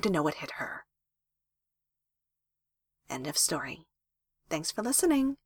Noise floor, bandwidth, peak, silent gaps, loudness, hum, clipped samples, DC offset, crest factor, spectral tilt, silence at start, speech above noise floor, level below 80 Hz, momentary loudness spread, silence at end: -87 dBFS; 19 kHz; -14 dBFS; none; -30 LUFS; none; under 0.1%; under 0.1%; 20 dB; -3 dB/octave; 0 s; 57 dB; -64 dBFS; 15 LU; 0.1 s